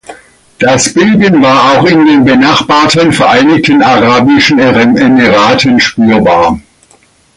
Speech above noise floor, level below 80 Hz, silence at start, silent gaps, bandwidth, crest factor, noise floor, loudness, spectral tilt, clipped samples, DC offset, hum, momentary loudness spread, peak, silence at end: 40 dB; -38 dBFS; 0.1 s; none; 11.5 kHz; 6 dB; -45 dBFS; -6 LUFS; -4.5 dB/octave; 0.1%; under 0.1%; none; 2 LU; 0 dBFS; 0.75 s